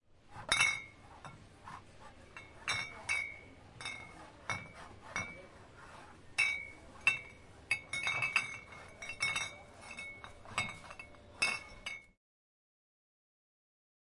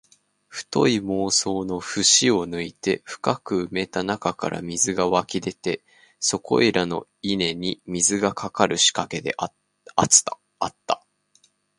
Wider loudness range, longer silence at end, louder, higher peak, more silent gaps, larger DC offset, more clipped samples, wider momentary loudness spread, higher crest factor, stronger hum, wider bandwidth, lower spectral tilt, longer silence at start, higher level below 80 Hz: first, 7 LU vs 4 LU; first, 2.1 s vs 0.8 s; second, -36 LUFS vs -22 LUFS; second, -12 dBFS vs 0 dBFS; neither; neither; neither; first, 21 LU vs 13 LU; about the same, 28 dB vs 24 dB; neither; about the same, 11.5 kHz vs 11.5 kHz; second, -1 dB/octave vs -2.5 dB/octave; second, 0.25 s vs 0.5 s; second, -64 dBFS vs -56 dBFS